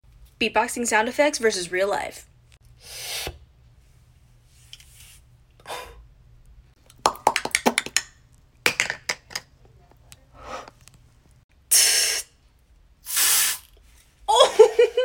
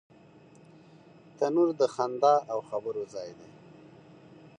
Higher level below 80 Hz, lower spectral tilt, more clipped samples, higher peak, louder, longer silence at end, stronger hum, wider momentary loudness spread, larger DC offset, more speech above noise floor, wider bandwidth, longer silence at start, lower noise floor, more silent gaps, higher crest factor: first, -54 dBFS vs -78 dBFS; second, -0.5 dB/octave vs -6 dB/octave; neither; first, -2 dBFS vs -12 dBFS; first, -21 LUFS vs -28 LUFS; second, 0 s vs 1.1 s; neither; first, 21 LU vs 15 LU; neither; first, 34 dB vs 28 dB; first, 17 kHz vs 9.8 kHz; second, 0.4 s vs 1.4 s; about the same, -57 dBFS vs -55 dBFS; first, 11.44-11.49 s vs none; about the same, 24 dB vs 20 dB